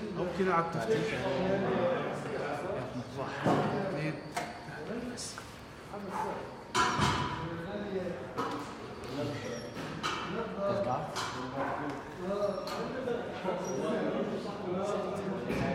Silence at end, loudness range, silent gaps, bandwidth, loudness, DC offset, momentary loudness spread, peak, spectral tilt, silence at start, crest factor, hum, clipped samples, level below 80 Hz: 0 s; 4 LU; none; 16 kHz; -34 LUFS; under 0.1%; 10 LU; -16 dBFS; -5 dB/octave; 0 s; 18 dB; none; under 0.1%; -58 dBFS